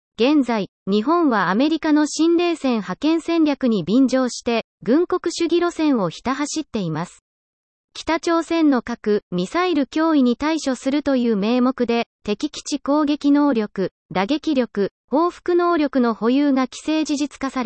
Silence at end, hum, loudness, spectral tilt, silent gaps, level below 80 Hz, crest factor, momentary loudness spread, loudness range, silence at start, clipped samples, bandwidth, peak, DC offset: 0 s; none; -20 LUFS; -5 dB/octave; 0.69-0.86 s, 4.64-4.78 s, 7.21-7.88 s, 9.22-9.31 s, 12.06-12.19 s, 13.91-14.09 s, 14.91-15.08 s; -56 dBFS; 14 dB; 7 LU; 4 LU; 0.2 s; under 0.1%; 8.8 kHz; -6 dBFS; under 0.1%